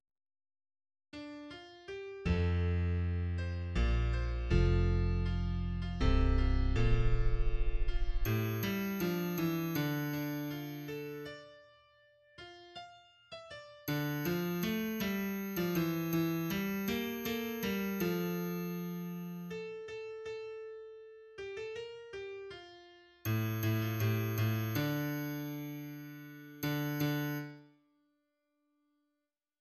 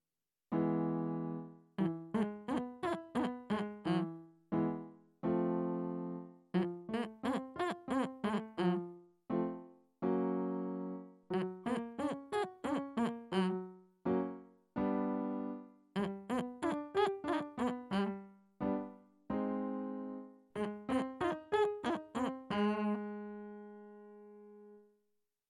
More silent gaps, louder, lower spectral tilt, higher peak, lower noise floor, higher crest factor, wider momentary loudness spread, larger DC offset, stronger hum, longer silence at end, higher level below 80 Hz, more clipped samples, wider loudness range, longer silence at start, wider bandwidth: neither; about the same, -36 LUFS vs -38 LUFS; about the same, -6.5 dB/octave vs -7.5 dB/octave; first, -16 dBFS vs -20 dBFS; about the same, -87 dBFS vs under -90 dBFS; about the same, 18 dB vs 20 dB; about the same, 16 LU vs 14 LU; neither; neither; first, 2 s vs 0.7 s; first, -40 dBFS vs -72 dBFS; neither; first, 10 LU vs 2 LU; first, 1.15 s vs 0.5 s; first, 13.5 kHz vs 12 kHz